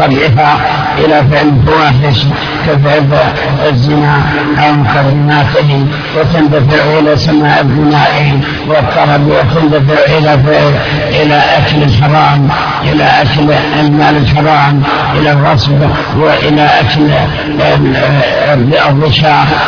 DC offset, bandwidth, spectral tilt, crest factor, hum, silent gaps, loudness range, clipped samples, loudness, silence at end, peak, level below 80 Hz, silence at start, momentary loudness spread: under 0.1%; 5.4 kHz; -7.5 dB/octave; 8 dB; none; none; 1 LU; 0.6%; -8 LUFS; 0 s; 0 dBFS; -28 dBFS; 0 s; 4 LU